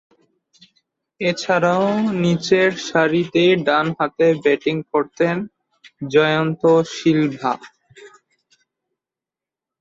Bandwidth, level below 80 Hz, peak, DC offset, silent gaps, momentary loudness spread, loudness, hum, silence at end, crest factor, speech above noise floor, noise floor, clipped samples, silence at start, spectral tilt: 7.8 kHz; -62 dBFS; -2 dBFS; under 0.1%; none; 7 LU; -18 LUFS; none; 1.75 s; 18 dB; 71 dB; -88 dBFS; under 0.1%; 1.2 s; -6 dB/octave